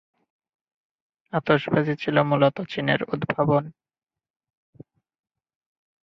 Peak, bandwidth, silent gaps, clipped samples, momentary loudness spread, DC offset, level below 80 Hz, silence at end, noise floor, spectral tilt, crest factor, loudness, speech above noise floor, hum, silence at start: -4 dBFS; 6.2 kHz; none; under 0.1%; 7 LU; under 0.1%; -62 dBFS; 2.3 s; under -90 dBFS; -8.5 dB/octave; 22 dB; -23 LUFS; over 68 dB; none; 1.35 s